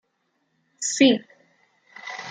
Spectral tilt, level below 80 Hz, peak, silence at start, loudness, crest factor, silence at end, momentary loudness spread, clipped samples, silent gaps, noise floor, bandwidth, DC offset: -2.5 dB/octave; -80 dBFS; -4 dBFS; 0.8 s; -21 LUFS; 22 dB; 0 s; 18 LU; under 0.1%; none; -72 dBFS; 9.6 kHz; under 0.1%